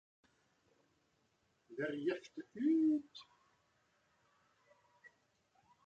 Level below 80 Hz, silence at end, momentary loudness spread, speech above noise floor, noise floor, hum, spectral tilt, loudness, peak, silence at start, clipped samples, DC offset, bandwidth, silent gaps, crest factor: -88 dBFS; 2.65 s; 21 LU; 41 dB; -79 dBFS; none; -6.5 dB/octave; -38 LUFS; -26 dBFS; 1.7 s; under 0.1%; under 0.1%; 7.2 kHz; none; 18 dB